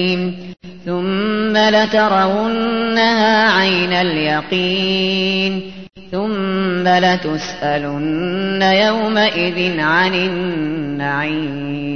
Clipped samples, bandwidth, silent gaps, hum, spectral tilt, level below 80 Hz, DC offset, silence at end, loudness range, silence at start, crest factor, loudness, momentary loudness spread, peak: under 0.1%; 6.6 kHz; none; none; -5.5 dB/octave; -50 dBFS; 0.7%; 0 s; 3 LU; 0 s; 14 dB; -16 LUFS; 10 LU; -2 dBFS